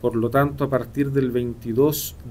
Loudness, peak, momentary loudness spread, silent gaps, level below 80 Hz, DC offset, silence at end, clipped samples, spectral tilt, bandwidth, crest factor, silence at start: -22 LUFS; -8 dBFS; 5 LU; none; -44 dBFS; under 0.1%; 0 s; under 0.1%; -6.5 dB/octave; 16 kHz; 14 dB; 0 s